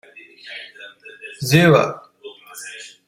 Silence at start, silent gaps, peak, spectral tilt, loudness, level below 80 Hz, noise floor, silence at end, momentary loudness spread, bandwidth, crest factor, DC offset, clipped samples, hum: 0.45 s; none; -2 dBFS; -5.5 dB/octave; -16 LUFS; -58 dBFS; -41 dBFS; 0.2 s; 26 LU; 16 kHz; 20 dB; under 0.1%; under 0.1%; none